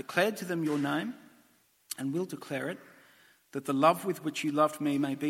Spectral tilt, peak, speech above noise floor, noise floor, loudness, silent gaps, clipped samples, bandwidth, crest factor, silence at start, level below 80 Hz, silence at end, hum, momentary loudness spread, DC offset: -5 dB/octave; -8 dBFS; 36 dB; -66 dBFS; -31 LUFS; none; under 0.1%; 16.5 kHz; 24 dB; 0.1 s; -80 dBFS; 0 s; none; 15 LU; under 0.1%